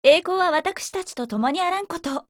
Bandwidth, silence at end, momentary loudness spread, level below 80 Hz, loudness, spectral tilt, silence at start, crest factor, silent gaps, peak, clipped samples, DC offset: 17 kHz; 0.1 s; 11 LU; -60 dBFS; -23 LUFS; -3 dB/octave; 0.05 s; 18 dB; none; -4 dBFS; under 0.1%; under 0.1%